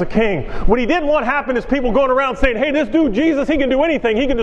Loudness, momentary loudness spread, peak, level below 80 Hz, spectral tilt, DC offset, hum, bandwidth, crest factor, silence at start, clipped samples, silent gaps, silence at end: -16 LUFS; 4 LU; 0 dBFS; -28 dBFS; -6.5 dB/octave; under 0.1%; none; 7.8 kHz; 16 dB; 0 s; under 0.1%; none; 0 s